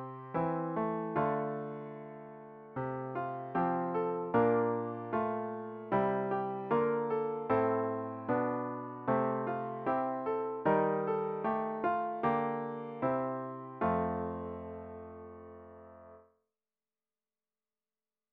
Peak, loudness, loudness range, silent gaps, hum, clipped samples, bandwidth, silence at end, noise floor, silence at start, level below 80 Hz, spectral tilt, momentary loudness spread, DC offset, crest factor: -16 dBFS; -34 LUFS; 7 LU; none; none; under 0.1%; 4.6 kHz; 2.15 s; under -90 dBFS; 0 s; -68 dBFS; -7 dB/octave; 15 LU; under 0.1%; 18 dB